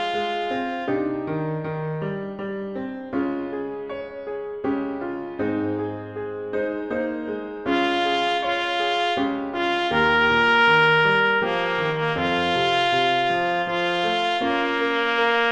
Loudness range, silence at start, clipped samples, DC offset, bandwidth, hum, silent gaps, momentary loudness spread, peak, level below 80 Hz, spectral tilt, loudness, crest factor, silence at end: 10 LU; 0 s; under 0.1%; under 0.1%; 10 kHz; none; none; 13 LU; -6 dBFS; -56 dBFS; -5.5 dB/octave; -22 LUFS; 18 dB; 0 s